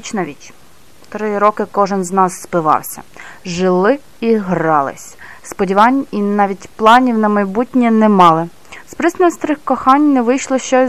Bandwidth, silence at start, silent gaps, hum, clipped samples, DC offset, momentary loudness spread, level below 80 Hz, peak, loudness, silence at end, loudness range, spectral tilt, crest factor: 14.5 kHz; 0.05 s; none; none; 0.4%; 1%; 16 LU; -52 dBFS; 0 dBFS; -14 LUFS; 0 s; 5 LU; -5.5 dB/octave; 14 dB